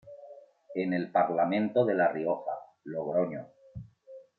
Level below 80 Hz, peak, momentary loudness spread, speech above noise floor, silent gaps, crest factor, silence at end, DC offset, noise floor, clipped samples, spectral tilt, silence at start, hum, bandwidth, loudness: -70 dBFS; -12 dBFS; 21 LU; 24 dB; none; 18 dB; 0.15 s; under 0.1%; -52 dBFS; under 0.1%; -9.5 dB/octave; 0.05 s; none; 4.5 kHz; -29 LUFS